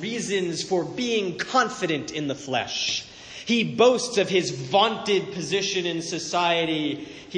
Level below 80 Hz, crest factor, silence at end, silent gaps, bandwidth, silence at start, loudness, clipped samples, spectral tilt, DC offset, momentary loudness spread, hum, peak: -62 dBFS; 20 dB; 0 s; none; 10 kHz; 0 s; -24 LUFS; under 0.1%; -3.5 dB/octave; under 0.1%; 9 LU; none; -4 dBFS